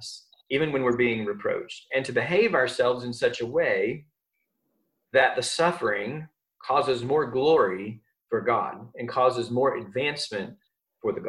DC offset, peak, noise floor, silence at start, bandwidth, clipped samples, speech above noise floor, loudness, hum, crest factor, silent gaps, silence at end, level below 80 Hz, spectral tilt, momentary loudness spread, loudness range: under 0.1%; -6 dBFS; -79 dBFS; 0 s; 12 kHz; under 0.1%; 54 dB; -25 LUFS; none; 20 dB; none; 0 s; -64 dBFS; -4.5 dB/octave; 13 LU; 2 LU